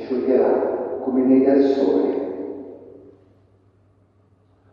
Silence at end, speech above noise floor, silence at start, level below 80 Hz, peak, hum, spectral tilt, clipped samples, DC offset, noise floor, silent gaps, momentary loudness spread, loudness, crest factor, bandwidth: 1.85 s; 41 dB; 0 s; -64 dBFS; -4 dBFS; none; -8.5 dB/octave; under 0.1%; under 0.1%; -58 dBFS; none; 16 LU; -19 LUFS; 16 dB; 5.6 kHz